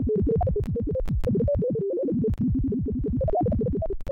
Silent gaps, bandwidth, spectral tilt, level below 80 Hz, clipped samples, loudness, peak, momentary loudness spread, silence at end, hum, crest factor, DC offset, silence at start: none; 5.6 kHz; -11.5 dB/octave; -32 dBFS; under 0.1%; -26 LUFS; -18 dBFS; 4 LU; 0 s; none; 6 dB; under 0.1%; 0 s